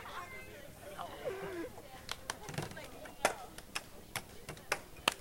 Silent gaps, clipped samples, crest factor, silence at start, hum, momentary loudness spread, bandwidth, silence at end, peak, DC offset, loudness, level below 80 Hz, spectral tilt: none; under 0.1%; 30 dB; 0 s; none; 13 LU; 16.5 kHz; 0 s; -12 dBFS; under 0.1%; -42 LUFS; -60 dBFS; -2.5 dB/octave